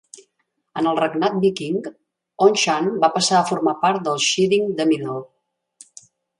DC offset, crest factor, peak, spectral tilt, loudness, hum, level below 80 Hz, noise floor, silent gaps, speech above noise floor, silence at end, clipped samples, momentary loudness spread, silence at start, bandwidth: under 0.1%; 18 dB; -2 dBFS; -4 dB/octave; -19 LUFS; none; -68 dBFS; -72 dBFS; none; 53 dB; 1.15 s; under 0.1%; 10 LU; 0.15 s; 11.5 kHz